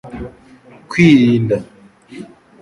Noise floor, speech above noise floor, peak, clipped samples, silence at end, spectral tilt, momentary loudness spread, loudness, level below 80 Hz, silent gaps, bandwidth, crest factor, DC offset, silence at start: -36 dBFS; 23 dB; 0 dBFS; under 0.1%; 0.35 s; -7 dB/octave; 26 LU; -13 LUFS; -46 dBFS; none; 11 kHz; 16 dB; under 0.1%; 0.05 s